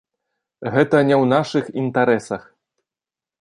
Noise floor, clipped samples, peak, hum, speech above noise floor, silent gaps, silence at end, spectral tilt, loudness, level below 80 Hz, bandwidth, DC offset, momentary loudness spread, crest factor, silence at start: -90 dBFS; under 0.1%; -2 dBFS; none; 72 dB; none; 1 s; -7 dB/octave; -18 LUFS; -62 dBFS; 11 kHz; under 0.1%; 15 LU; 18 dB; 0.6 s